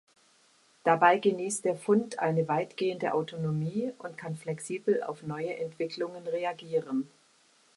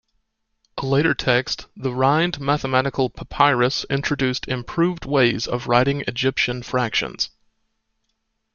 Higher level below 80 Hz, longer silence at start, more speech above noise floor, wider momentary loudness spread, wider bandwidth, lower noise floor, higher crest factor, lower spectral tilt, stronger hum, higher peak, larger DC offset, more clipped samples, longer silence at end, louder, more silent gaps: second, -76 dBFS vs -48 dBFS; about the same, 0.85 s vs 0.75 s; second, 35 dB vs 52 dB; first, 12 LU vs 7 LU; first, 11.5 kHz vs 7.2 kHz; second, -64 dBFS vs -73 dBFS; about the same, 22 dB vs 20 dB; about the same, -5.5 dB/octave vs -5.5 dB/octave; neither; second, -10 dBFS vs -2 dBFS; neither; neither; second, 0.7 s vs 1.25 s; second, -30 LUFS vs -21 LUFS; neither